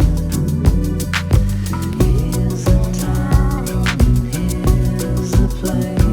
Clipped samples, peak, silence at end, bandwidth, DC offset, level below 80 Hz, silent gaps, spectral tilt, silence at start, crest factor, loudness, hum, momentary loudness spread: under 0.1%; 0 dBFS; 0 s; 19.5 kHz; under 0.1%; -20 dBFS; none; -6.5 dB/octave; 0 s; 14 dB; -17 LUFS; none; 4 LU